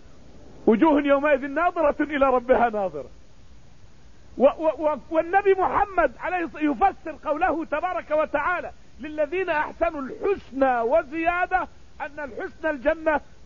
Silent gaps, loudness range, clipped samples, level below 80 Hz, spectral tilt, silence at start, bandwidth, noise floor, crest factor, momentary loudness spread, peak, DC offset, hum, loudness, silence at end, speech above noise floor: none; 4 LU; under 0.1%; -48 dBFS; -7 dB/octave; 0.35 s; 7.2 kHz; -51 dBFS; 18 dB; 13 LU; -6 dBFS; 0.6%; none; -23 LUFS; 0.25 s; 28 dB